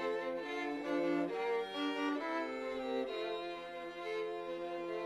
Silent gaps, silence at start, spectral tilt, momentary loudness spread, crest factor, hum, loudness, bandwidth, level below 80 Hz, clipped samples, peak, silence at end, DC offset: none; 0 s; -5 dB/octave; 6 LU; 14 dB; none; -39 LUFS; 13 kHz; -74 dBFS; under 0.1%; -24 dBFS; 0 s; under 0.1%